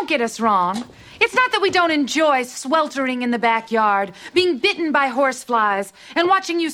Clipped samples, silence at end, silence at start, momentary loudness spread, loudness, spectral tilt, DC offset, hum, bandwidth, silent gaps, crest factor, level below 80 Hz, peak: under 0.1%; 0 s; 0 s; 5 LU; -19 LUFS; -3 dB/octave; under 0.1%; none; 16 kHz; none; 18 dB; -62 dBFS; -2 dBFS